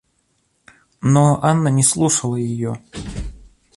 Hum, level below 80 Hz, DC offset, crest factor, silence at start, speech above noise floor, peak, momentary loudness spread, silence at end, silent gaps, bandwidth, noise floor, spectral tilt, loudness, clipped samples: none; -40 dBFS; under 0.1%; 18 dB; 1 s; 49 dB; -2 dBFS; 17 LU; 0.4 s; none; 11.5 kHz; -65 dBFS; -5.5 dB/octave; -17 LUFS; under 0.1%